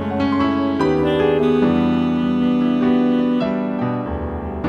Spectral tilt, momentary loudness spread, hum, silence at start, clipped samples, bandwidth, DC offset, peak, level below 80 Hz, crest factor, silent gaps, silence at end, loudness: -8.5 dB/octave; 6 LU; none; 0 s; under 0.1%; 6.4 kHz; under 0.1%; -6 dBFS; -38 dBFS; 12 dB; none; 0 s; -18 LUFS